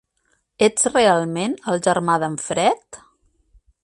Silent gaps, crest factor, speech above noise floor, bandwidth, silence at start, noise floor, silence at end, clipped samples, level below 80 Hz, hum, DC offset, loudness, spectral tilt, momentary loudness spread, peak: none; 18 dB; 48 dB; 11.5 kHz; 0.6 s; -67 dBFS; 0.9 s; under 0.1%; -58 dBFS; none; under 0.1%; -19 LUFS; -3.5 dB/octave; 8 LU; -4 dBFS